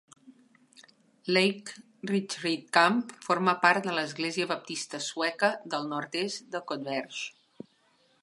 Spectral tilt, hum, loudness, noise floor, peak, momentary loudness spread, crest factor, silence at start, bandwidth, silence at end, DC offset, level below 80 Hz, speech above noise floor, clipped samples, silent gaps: -3.5 dB/octave; none; -29 LUFS; -67 dBFS; -6 dBFS; 14 LU; 24 dB; 0.25 s; 11.5 kHz; 0.9 s; under 0.1%; -82 dBFS; 38 dB; under 0.1%; none